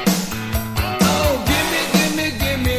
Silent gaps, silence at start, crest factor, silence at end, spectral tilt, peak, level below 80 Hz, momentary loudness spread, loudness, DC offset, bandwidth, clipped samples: none; 0 s; 18 dB; 0 s; -4 dB/octave; -2 dBFS; -28 dBFS; 6 LU; -18 LUFS; under 0.1%; 16 kHz; under 0.1%